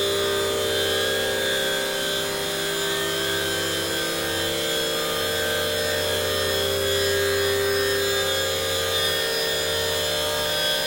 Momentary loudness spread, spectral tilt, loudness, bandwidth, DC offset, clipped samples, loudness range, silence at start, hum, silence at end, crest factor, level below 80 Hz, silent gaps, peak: 2 LU; -2 dB/octave; -22 LUFS; 16.5 kHz; 0.1%; under 0.1%; 2 LU; 0 s; none; 0 s; 14 dB; -54 dBFS; none; -8 dBFS